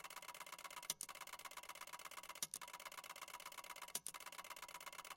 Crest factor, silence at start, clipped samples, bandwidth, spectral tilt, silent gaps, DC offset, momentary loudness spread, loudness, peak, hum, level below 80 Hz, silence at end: 32 dB; 0 s; under 0.1%; 17 kHz; 1 dB/octave; none; under 0.1%; 6 LU; -51 LUFS; -22 dBFS; none; -84 dBFS; 0 s